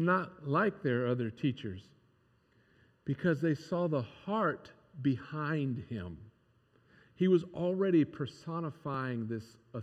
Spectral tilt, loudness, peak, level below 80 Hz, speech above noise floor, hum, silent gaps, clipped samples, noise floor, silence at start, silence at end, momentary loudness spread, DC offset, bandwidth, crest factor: -8.5 dB/octave; -34 LUFS; -16 dBFS; -72 dBFS; 37 dB; none; none; under 0.1%; -70 dBFS; 0 s; 0 s; 14 LU; under 0.1%; 9.2 kHz; 18 dB